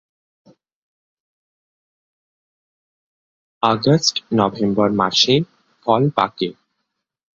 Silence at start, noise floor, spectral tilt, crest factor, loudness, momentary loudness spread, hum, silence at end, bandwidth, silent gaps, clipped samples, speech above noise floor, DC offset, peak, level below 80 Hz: 3.6 s; -77 dBFS; -5 dB/octave; 20 dB; -18 LUFS; 11 LU; none; 0.85 s; 7.8 kHz; none; under 0.1%; 60 dB; under 0.1%; 0 dBFS; -58 dBFS